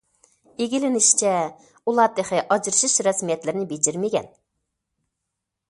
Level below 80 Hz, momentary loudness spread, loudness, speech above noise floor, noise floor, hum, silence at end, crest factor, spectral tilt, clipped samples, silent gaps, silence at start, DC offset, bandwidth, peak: -68 dBFS; 12 LU; -21 LUFS; 60 dB; -82 dBFS; none; 1.45 s; 22 dB; -2.5 dB/octave; under 0.1%; none; 0.6 s; under 0.1%; 11.5 kHz; -2 dBFS